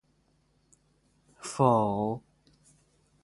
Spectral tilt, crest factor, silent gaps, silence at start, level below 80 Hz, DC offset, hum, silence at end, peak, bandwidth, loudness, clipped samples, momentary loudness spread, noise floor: -7 dB/octave; 24 dB; none; 1.4 s; -64 dBFS; under 0.1%; none; 1.05 s; -8 dBFS; 11.5 kHz; -28 LUFS; under 0.1%; 16 LU; -69 dBFS